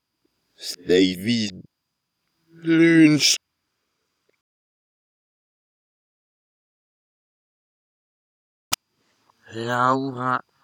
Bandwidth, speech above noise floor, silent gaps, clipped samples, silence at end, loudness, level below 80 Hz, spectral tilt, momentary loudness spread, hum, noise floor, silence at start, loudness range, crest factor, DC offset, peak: 19 kHz; 59 dB; 4.41-8.71 s; under 0.1%; 0.25 s; -20 LUFS; -70 dBFS; -4 dB/octave; 18 LU; none; -79 dBFS; 0.6 s; 17 LU; 24 dB; under 0.1%; 0 dBFS